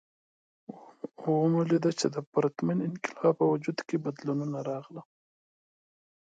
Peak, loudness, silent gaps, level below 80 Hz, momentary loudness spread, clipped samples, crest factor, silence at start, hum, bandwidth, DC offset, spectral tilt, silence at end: -12 dBFS; -29 LUFS; 2.27-2.32 s; -80 dBFS; 20 LU; under 0.1%; 18 dB; 0.7 s; none; 9.2 kHz; under 0.1%; -6.5 dB/octave; 1.3 s